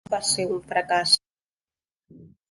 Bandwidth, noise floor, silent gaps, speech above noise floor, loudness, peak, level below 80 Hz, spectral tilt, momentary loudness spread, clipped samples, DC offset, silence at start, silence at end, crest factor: 12 kHz; under -90 dBFS; 1.49-1.65 s, 1.92-1.96 s; over 65 dB; -22 LUFS; -6 dBFS; -64 dBFS; -1.5 dB/octave; 6 LU; under 0.1%; under 0.1%; 0.1 s; 0.25 s; 22 dB